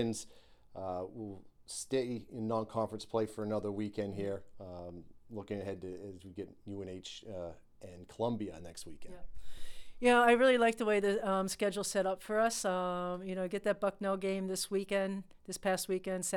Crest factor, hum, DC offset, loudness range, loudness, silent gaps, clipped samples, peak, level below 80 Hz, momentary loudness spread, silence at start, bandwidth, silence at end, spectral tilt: 22 dB; none; under 0.1%; 13 LU; -34 LUFS; none; under 0.1%; -14 dBFS; -60 dBFS; 20 LU; 0 s; 18.5 kHz; 0 s; -4.5 dB/octave